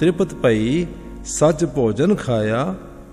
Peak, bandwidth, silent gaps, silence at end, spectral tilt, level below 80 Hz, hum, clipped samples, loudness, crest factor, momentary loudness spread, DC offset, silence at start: -4 dBFS; 13.5 kHz; none; 0 s; -6 dB/octave; -40 dBFS; none; under 0.1%; -19 LUFS; 14 dB; 10 LU; under 0.1%; 0 s